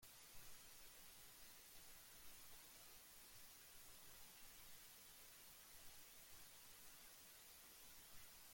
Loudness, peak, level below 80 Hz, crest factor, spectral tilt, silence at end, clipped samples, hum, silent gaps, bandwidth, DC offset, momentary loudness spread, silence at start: -61 LUFS; -46 dBFS; -78 dBFS; 16 dB; -0.5 dB/octave; 0 s; under 0.1%; none; none; 17 kHz; under 0.1%; 0 LU; 0 s